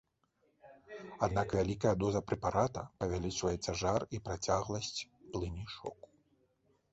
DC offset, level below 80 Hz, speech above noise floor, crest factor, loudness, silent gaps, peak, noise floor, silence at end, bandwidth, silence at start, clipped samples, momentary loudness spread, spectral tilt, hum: under 0.1%; -54 dBFS; 41 dB; 20 dB; -36 LUFS; none; -16 dBFS; -76 dBFS; 1 s; 8 kHz; 0.65 s; under 0.1%; 12 LU; -5.5 dB/octave; none